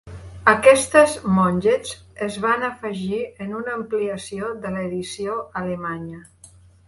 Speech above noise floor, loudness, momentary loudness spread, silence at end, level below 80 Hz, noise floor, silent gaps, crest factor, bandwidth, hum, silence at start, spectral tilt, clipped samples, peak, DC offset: 28 dB; -21 LUFS; 15 LU; 0.4 s; -50 dBFS; -49 dBFS; none; 20 dB; 11.5 kHz; none; 0.05 s; -5 dB/octave; under 0.1%; 0 dBFS; under 0.1%